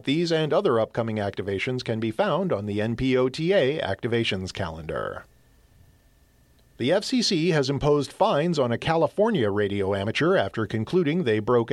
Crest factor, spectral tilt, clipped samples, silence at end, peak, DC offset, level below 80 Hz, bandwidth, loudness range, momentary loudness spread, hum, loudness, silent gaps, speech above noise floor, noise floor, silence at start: 16 dB; -6 dB/octave; under 0.1%; 0 s; -8 dBFS; under 0.1%; -52 dBFS; 12.5 kHz; 5 LU; 7 LU; none; -24 LUFS; none; 35 dB; -59 dBFS; 0.05 s